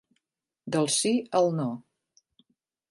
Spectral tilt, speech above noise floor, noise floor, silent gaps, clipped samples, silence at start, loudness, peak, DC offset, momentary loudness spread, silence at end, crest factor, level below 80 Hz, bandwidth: -4 dB/octave; 58 dB; -84 dBFS; none; under 0.1%; 0.65 s; -26 LUFS; -10 dBFS; under 0.1%; 15 LU; 1.1 s; 18 dB; -76 dBFS; 11.5 kHz